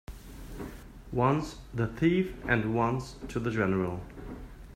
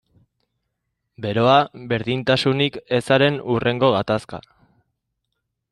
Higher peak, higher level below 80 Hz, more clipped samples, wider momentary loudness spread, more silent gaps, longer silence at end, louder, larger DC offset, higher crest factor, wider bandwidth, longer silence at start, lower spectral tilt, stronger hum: second, -10 dBFS vs -2 dBFS; first, -48 dBFS vs -56 dBFS; neither; first, 19 LU vs 9 LU; neither; second, 0 s vs 1.3 s; second, -30 LUFS vs -19 LUFS; neither; about the same, 20 dB vs 20 dB; first, 16 kHz vs 12 kHz; second, 0.1 s vs 1.2 s; about the same, -7.5 dB/octave vs -6.5 dB/octave; neither